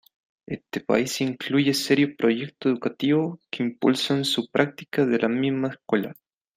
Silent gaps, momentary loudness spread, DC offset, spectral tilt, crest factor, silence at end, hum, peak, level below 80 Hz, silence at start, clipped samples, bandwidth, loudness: none; 8 LU; under 0.1%; -5 dB/octave; 20 dB; 0.45 s; none; -4 dBFS; -68 dBFS; 0.5 s; under 0.1%; 15.5 kHz; -24 LUFS